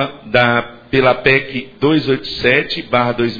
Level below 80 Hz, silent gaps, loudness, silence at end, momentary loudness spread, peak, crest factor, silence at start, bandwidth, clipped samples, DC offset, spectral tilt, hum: -42 dBFS; none; -15 LUFS; 0 s; 6 LU; 0 dBFS; 16 dB; 0 s; 5.4 kHz; under 0.1%; under 0.1%; -7 dB/octave; none